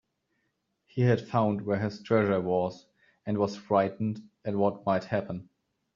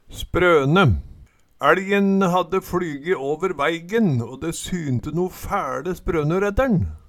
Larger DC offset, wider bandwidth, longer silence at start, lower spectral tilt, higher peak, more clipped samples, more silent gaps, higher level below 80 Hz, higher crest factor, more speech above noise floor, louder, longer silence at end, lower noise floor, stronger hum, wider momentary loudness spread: neither; second, 7.2 kHz vs 17 kHz; first, 0.95 s vs 0.1 s; about the same, -7 dB/octave vs -6.5 dB/octave; second, -10 dBFS vs -2 dBFS; neither; neither; second, -68 dBFS vs -38 dBFS; about the same, 20 dB vs 20 dB; first, 50 dB vs 27 dB; second, -29 LUFS vs -21 LUFS; first, 0.55 s vs 0.1 s; first, -78 dBFS vs -47 dBFS; neither; about the same, 11 LU vs 9 LU